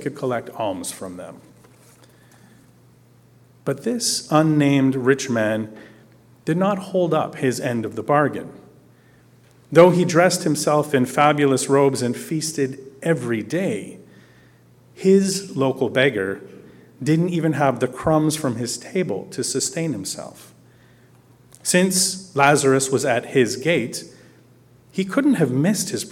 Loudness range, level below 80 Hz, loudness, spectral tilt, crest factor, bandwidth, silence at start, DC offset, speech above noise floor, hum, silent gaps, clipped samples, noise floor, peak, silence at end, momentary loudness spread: 7 LU; -62 dBFS; -20 LUFS; -5 dB/octave; 20 dB; 17 kHz; 0 s; under 0.1%; 33 dB; none; none; under 0.1%; -52 dBFS; -2 dBFS; 0 s; 12 LU